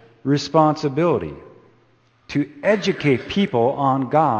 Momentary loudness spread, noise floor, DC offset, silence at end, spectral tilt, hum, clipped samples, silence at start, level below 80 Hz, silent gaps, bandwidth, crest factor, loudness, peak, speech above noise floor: 8 LU; -58 dBFS; under 0.1%; 0 s; -6.5 dB/octave; none; under 0.1%; 0.25 s; -54 dBFS; none; 8.6 kHz; 18 dB; -20 LUFS; -2 dBFS; 39 dB